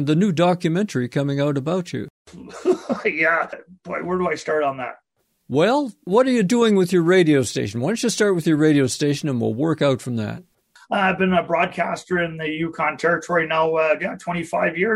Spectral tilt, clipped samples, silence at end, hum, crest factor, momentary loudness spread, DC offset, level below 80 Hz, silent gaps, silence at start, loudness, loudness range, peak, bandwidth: -5.5 dB/octave; under 0.1%; 0 s; none; 16 dB; 10 LU; under 0.1%; -60 dBFS; 2.10-2.25 s; 0 s; -20 LUFS; 5 LU; -4 dBFS; 15.5 kHz